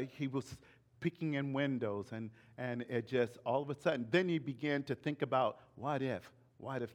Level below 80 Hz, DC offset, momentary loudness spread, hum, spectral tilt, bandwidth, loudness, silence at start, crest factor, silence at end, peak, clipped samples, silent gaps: -76 dBFS; under 0.1%; 11 LU; none; -7 dB/octave; 14 kHz; -38 LUFS; 0 s; 20 dB; 0 s; -18 dBFS; under 0.1%; none